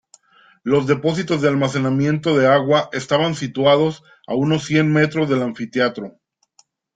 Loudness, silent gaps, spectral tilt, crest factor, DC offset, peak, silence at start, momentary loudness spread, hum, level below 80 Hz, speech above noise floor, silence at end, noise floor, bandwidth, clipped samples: -18 LUFS; none; -6 dB/octave; 16 dB; under 0.1%; -2 dBFS; 0.65 s; 8 LU; none; -58 dBFS; 41 dB; 0.85 s; -58 dBFS; 9.2 kHz; under 0.1%